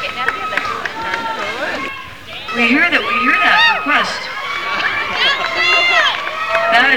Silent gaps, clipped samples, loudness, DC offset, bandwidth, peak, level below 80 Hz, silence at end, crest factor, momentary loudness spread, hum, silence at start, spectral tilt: none; under 0.1%; -14 LUFS; 1%; over 20 kHz; -2 dBFS; -50 dBFS; 0 s; 14 dB; 11 LU; none; 0 s; -2.5 dB/octave